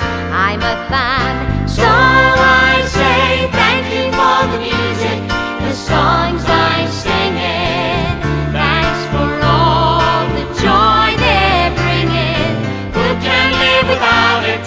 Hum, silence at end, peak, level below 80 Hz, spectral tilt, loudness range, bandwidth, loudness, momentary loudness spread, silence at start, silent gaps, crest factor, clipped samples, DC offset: none; 0 s; 0 dBFS; -26 dBFS; -5 dB/octave; 4 LU; 8 kHz; -13 LUFS; 7 LU; 0 s; none; 12 dB; under 0.1%; under 0.1%